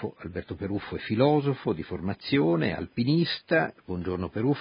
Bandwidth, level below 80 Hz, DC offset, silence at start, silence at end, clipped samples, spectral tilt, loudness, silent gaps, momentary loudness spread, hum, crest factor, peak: 5.4 kHz; -50 dBFS; under 0.1%; 0 s; 0 s; under 0.1%; -11 dB/octave; -28 LUFS; none; 11 LU; none; 18 dB; -8 dBFS